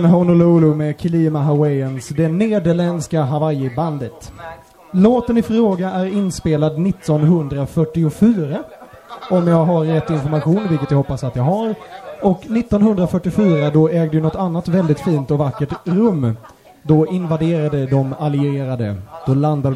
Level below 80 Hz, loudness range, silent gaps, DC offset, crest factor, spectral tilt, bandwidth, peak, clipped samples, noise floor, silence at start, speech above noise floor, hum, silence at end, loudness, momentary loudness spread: -44 dBFS; 2 LU; none; under 0.1%; 16 dB; -8.5 dB/octave; 12 kHz; 0 dBFS; under 0.1%; -35 dBFS; 0 s; 19 dB; none; 0 s; -17 LUFS; 9 LU